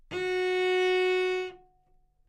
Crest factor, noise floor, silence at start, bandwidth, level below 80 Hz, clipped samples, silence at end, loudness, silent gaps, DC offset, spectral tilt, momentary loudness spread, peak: 10 dB; -65 dBFS; 0.1 s; 10 kHz; -64 dBFS; under 0.1%; 0.7 s; -27 LUFS; none; under 0.1%; -3.5 dB/octave; 8 LU; -18 dBFS